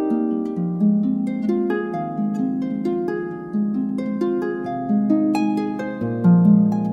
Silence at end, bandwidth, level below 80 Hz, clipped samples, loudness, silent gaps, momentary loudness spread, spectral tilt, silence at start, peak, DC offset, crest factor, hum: 0 s; 8 kHz; -60 dBFS; under 0.1%; -21 LUFS; none; 10 LU; -9.5 dB/octave; 0 s; -4 dBFS; under 0.1%; 16 dB; none